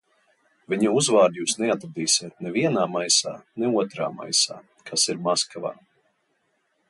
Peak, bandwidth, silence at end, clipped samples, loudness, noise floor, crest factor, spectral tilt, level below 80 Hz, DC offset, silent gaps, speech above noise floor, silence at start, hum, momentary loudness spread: -6 dBFS; 11.5 kHz; 1.15 s; under 0.1%; -23 LUFS; -71 dBFS; 18 dB; -2.5 dB/octave; -70 dBFS; under 0.1%; none; 47 dB; 0.7 s; none; 11 LU